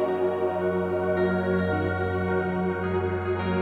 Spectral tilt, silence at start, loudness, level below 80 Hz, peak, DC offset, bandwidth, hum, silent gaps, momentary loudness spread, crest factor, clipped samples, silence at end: -9 dB/octave; 0 s; -26 LUFS; -52 dBFS; -14 dBFS; under 0.1%; 4.6 kHz; none; none; 3 LU; 12 dB; under 0.1%; 0 s